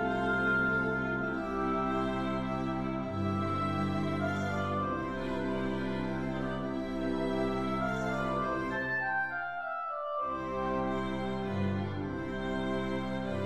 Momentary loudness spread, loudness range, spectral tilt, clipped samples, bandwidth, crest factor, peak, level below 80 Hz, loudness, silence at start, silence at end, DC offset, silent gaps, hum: 5 LU; 2 LU; -7 dB/octave; under 0.1%; 11.5 kHz; 14 dB; -18 dBFS; -52 dBFS; -33 LUFS; 0 s; 0 s; 0.3%; none; none